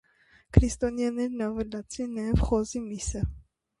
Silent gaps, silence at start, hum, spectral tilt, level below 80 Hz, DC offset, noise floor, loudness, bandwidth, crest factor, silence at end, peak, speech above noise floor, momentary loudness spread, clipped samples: none; 0.55 s; none; -6.5 dB/octave; -34 dBFS; under 0.1%; -61 dBFS; -29 LUFS; 11.5 kHz; 26 dB; 0.4 s; -2 dBFS; 34 dB; 10 LU; under 0.1%